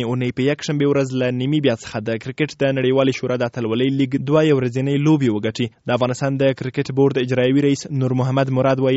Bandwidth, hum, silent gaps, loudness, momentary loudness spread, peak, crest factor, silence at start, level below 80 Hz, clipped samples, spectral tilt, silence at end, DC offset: 8 kHz; none; none; -19 LUFS; 6 LU; -2 dBFS; 16 dB; 0 s; -56 dBFS; under 0.1%; -6 dB/octave; 0 s; under 0.1%